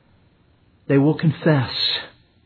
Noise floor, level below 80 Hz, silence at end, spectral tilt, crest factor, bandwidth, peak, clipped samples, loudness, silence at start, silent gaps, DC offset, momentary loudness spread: -57 dBFS; -58 dBFS; 0.4 s; -8.5 dB/octave; 16 dB; 4.6 kHz; -6 dBFS; under 0.1%; -19 LUFS; 0.9 s; none; under 0.1%; 7 LU